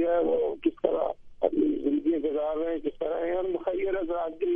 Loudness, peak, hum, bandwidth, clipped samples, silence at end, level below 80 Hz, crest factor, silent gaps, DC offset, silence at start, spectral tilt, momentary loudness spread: -28 LUFS; -10 dBFS; none; 3.6 kHz; under 0.1%; 0 s; -54 dBFS; 18 dB; none; under 0.1%; 0 s; -8.5 dB/octave; 5 LU